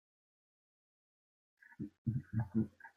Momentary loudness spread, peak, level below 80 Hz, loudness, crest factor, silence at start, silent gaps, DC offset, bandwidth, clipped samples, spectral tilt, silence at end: 12 LU; -24 dBFS; -72 dBFS; -40 LUFS; 20 dB; 1.8 s; 1.98-2.05 s; under 0.1%; 2.4 kHz; under 0.1%; -11 dB/octave; 0.1 s